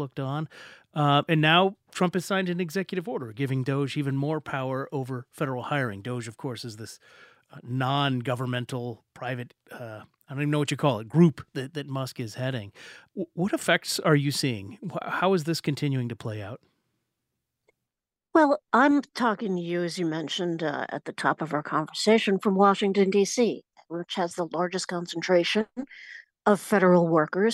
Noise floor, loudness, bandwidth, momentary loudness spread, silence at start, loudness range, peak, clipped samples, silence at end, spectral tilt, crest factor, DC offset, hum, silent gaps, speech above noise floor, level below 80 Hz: -89 dBFS; -26 LUFS; 16 kHz; 16 LU; 0 s; 7 LU; -6 dBFS; under 0.1%; 0 s; -5.5 dB/octave; 20 dB; under 0.1%; none; none; 63 dB; -72 dBFS